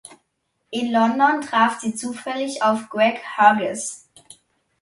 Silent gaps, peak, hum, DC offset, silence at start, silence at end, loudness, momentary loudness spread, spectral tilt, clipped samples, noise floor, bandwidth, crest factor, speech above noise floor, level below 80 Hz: none; -2 dBFS; none; under 0.1%; 0.7 s; 0.85 s; -20 LUFS; 13 LU; -3.5 dB/octave; under 0.1%; -72 dBFS; 11.5 kHz; 20 dB; 52 dB; -70 dBFS